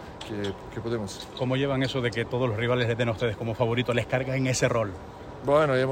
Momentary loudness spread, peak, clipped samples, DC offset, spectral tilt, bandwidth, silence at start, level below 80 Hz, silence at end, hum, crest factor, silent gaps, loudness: 10 LU; -8 dBFS; under 0.1%; under 0.1%; -5.5 dB/octave; 15.5 kHz; 0 s; -50 dBFS; 0 s; none; 18 dB; none; -27 LUFS